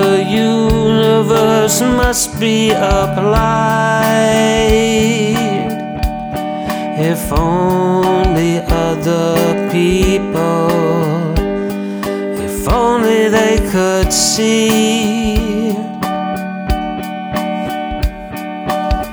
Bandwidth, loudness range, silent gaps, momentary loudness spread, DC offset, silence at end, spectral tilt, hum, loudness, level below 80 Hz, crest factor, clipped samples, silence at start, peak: over 20 kHz; 4 LU; none; 9 LU; under 0.1%; 0 s; -5 dB/octave; none; -14 LUFS; -24 dBFS; 14 dB; under 0.1%; 0 s; 0 dBFS